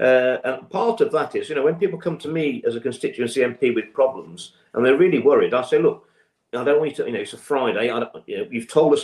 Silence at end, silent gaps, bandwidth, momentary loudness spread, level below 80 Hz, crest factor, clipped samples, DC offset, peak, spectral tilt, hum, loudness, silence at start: 0 s; none; 12 kHz; 12 LU; -70 dBFS; 16 dB; under 0.1%; under 0.1%; -4 dBFS; -5.5 dB/octave; none; -21 LUFS; 0 s